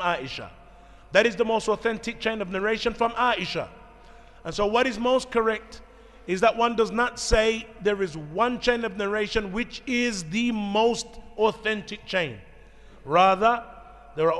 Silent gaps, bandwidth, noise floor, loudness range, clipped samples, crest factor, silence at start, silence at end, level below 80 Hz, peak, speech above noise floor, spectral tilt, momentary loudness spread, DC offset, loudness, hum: none; 12 kHz; -49 dBFS; 2 LU; under 0.1%; 20 dB; 0 s; 0 s; -44 dBFS; -6 dBFS; 24 dB; -4 dB/octave; 11 LU; under 0.1%; -25 LUFS; none